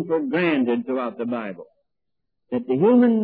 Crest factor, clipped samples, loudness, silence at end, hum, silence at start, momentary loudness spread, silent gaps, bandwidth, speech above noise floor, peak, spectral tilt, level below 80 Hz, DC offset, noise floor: 16 dB; under 0.1%; -22 LUFS; 0 s; none; 0 s; 14 LU; none; 4.7 kHz; 61 dB; -6 dBFS; -10.5 dB/octave; -72 dBFS; under 0.1%; -82 dBFS